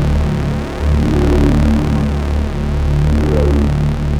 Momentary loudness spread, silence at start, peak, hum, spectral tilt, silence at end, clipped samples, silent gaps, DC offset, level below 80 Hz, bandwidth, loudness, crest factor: 6 LU; 0 s; 0 dBFS; none; -8 dB/octave; 0 s; under 0.1%; none; under 0.1%; -16 dBFS; 10.5 kHz; -15 LUFS; 12 dB